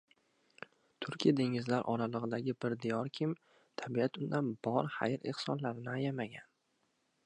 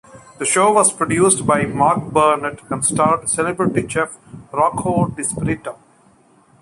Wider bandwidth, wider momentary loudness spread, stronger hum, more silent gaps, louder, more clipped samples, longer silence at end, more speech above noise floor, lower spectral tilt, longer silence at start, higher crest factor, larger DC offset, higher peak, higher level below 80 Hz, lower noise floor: second, 10 kHz vs 11.5 kHz; first, 13 LU vs 10 LU; neither; neither; second, -36 LUFS vs -17 LUFS; neither; about the same, 0.85 s vs 0.85 s; first, 43 dB vs 35 dB; first, -7 dB/octave vs -4.5 dB/octave; first, 1 s vs 0.15 s; about the same, 22 dB vs 18 dB; neither; second, -16 dBFS vs 0 dBFS; second, -80 dBFS vs -48 dBFS; first, -79 dBFS vs -52 dBFS